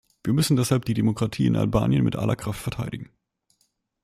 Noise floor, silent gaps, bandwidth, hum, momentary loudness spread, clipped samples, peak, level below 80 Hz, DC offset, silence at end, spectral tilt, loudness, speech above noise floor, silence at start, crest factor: -71 dBFS; none; 15.5 kHz; none; 9 LU; under 0.1%; -6 dBFS; -46 dBFS; under 0.1%; 1 s; -6.5 dB/octave; -24 LUFS; 48 dB; 0.25 s; 18 dB